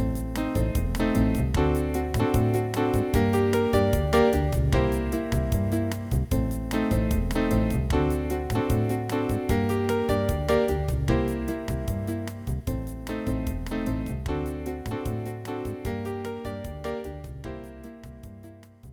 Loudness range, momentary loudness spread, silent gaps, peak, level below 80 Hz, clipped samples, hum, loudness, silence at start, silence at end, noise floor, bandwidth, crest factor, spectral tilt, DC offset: 9 LU; 11 LU; none; -10 dBFS; -32 dBFS; under 0.1%; none; -26 LUFS; 0 s; 0 s; -47 dBFS; over 20 kHz; 16 dB; -7 dB/octave; under 0.1%